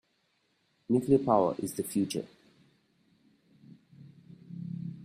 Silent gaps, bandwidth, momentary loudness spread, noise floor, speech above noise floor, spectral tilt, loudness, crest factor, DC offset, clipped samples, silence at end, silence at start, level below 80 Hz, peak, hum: none; 15.5 kHz; 18 LU; -74 dBFS; 46 dB; -6.5 dB/octave; -30 LUFS; 22 dB; under 0.1%; under 0.1%; 0 s; 0.9 s; -70 dBFS; -12 dBFS; none